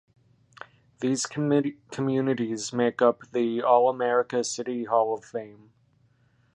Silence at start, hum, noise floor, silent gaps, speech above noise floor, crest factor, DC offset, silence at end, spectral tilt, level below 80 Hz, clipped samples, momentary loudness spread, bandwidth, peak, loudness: 1 s; none; -64 dBFS; none; 39 dB; 20 dB; under 0.1%; 1 s; -5 dB/octave; -72 dBFS; under 0.1%; 11 LU; 11 kHz; -6 dBFS; -26 LUFS